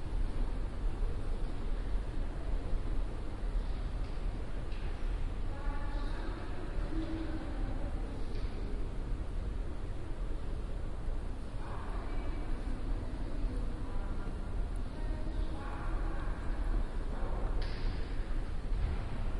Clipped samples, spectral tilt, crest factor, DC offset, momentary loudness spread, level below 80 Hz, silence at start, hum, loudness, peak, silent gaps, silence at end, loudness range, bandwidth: under 0.1%; -7 dB/octave; 14 dB; under 0.1%; 3 LU; -36 dBFS; 0 s; none; -41 LUFS; -20 dBFS; none; 0 s; 2 LU; 10.5 kHz